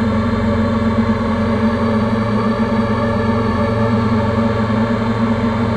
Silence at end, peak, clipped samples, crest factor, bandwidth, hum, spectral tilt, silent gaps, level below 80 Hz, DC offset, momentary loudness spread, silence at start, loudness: 0 s; -4 dBFS; under 0.1%; 12 dB; 9 kHz; none; -8 dB/octave; none; -34 dBFS; under 0.1%; 1 LU; 0 s; -16 LUFS